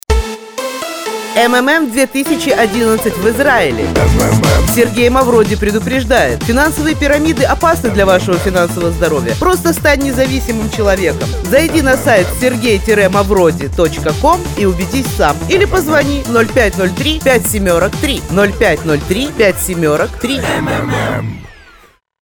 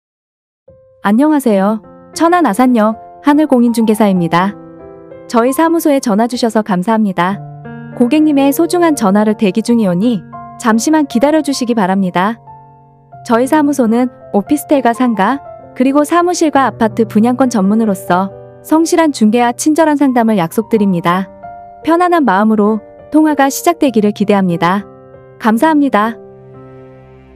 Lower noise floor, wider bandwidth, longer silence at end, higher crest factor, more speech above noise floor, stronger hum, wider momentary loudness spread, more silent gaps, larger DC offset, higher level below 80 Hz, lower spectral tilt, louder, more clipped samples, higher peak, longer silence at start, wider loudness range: about the same, -45 dBFS vs -42 dBFS; first, 20 kHz vs 15.5 kHz; first, 0.7 s vs 0.5 s; about the same, 12 dB vs 12 dB; about the same, 33 dB vs 31 dB; neither; about the same, 6 LU vs 8 LU; neither; neither; first, -24 dBFS vs -54 dBFS; about the same, -5 dB/octave vs -5.5 dB/octave; about the same, -12 LUFS vs -12 LUFS; second, under 0.1% vs 0.2%; about the same, 0 dBFS vs 0 dBFS; second, 0.1 s vs 1.05 s; about the same, 2 LU vs 2 LU